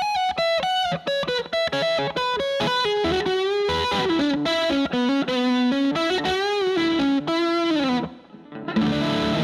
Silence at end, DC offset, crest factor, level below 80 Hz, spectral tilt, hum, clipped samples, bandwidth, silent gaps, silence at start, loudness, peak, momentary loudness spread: 0 s; under 0.1%; 12 dB; -50 dBFS; -5 dB/octave; none; under 0.1%; 13.5 kHz; none; 0 s; -22 LUFS; -12 dBFS; 3 LU